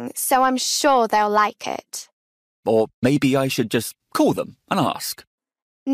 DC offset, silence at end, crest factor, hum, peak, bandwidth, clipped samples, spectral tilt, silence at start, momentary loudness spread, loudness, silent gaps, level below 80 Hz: under 0.1%; 0 s; 14 dB; none; -6 dBFS; 15.5 kHz; under 0.1%; -4 dB/octave; 0 s; 13 LU; -20 LUFS; 2.13-2.63 s, 2.94-3.02 s, 5.27-5.38 s, 5.62-5.86 s; -60 dBFS